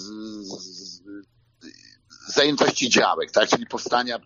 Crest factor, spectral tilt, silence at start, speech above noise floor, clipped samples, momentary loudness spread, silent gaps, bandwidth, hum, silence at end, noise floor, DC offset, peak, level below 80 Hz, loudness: 22 dB; -2.5 dB/octave; 0 s; 30 dB; under 0.1%; 20 LU; none; 7.6 kHz; none; 0.05 s; -51 dBFS; under 0.1%; -4 dBFS; -68 dBFS; -20 LUFS